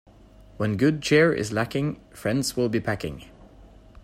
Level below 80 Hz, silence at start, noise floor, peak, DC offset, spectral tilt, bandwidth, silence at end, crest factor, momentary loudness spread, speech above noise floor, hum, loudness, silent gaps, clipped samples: -52 dBFS; 0.6 s; -50 dBFS; -8 dBFS; under 0.1%; -5.5 dB/octave; 15.5 kHz; 0.4 s; 18 dB; 12 LU; 26 dB; none; -24 LUFS; none; under 0.1%